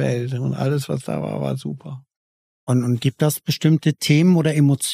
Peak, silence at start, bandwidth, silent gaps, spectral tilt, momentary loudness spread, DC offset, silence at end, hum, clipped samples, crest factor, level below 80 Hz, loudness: -4 dBFS; 0 s; 15.5 kHz; 2.17-2.67 s; -6 dB/octave; 14 LU; under 0.1%; 0 s; none; under 0.1%; 16 dB; -60 dBFS; -20 LUFS